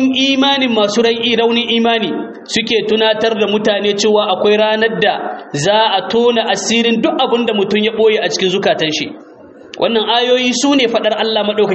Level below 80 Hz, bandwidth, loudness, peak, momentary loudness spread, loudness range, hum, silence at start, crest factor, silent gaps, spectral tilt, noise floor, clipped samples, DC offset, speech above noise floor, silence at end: -58 dBFS; 8.2 kHz; -13 LUFS; 0 dBFS; 5 LU; 1 LU; none; 0 s; 14 dB; none; -3.5 dB/octave; -36 dBFS; under 0.1%; under 0.1%; 22 dB; 0 s